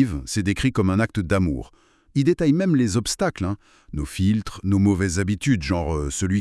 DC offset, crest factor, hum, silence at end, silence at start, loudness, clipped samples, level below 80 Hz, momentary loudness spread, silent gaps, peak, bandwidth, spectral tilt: under 0.1%; 16 dB; none; 0 s; 0 s; -22 LUFS; under 0.1%; -40 dBFS; 9 LU; none; -6 dBFS; 12 kHz; -6 dB/octave